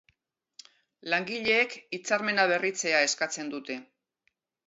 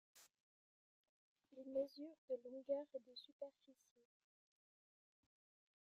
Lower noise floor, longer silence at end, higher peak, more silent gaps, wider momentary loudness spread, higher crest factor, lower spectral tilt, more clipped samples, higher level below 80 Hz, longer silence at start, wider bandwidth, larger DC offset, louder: second, -76 dBFS vs under -90 dBFS; second, 0.85 s vs 2.1 s; first, -10 dBFS vs -32 dBFS; second, none vs 0.40-1.36 s, 2.18-2.28 s, 3.32-3.39 s; second, 13 LU vs 17 LU; about the same, 20 dB vs 22 dB; second, -2 dB/octave vs -4 dB/octave; neither; first, -78 dBFS vs under -90 dBFS; first, 1.05 s vs 0.15 s; second, 8.2 kHz vs 13 kHz; neither; first, -27 LUFS vs -50 LUFS